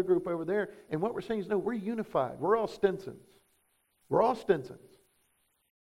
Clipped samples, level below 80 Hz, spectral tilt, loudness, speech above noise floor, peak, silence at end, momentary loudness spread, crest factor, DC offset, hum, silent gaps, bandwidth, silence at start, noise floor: under 0.1%; -66 dBFS; -7.5 dB/octave; -31 LUFS; 43 dB; -12 dBFS; 1.25 s; 8 LU; 20 dB; under 0.1%; none; none; 13 kHz; 0 s; -74 dBFS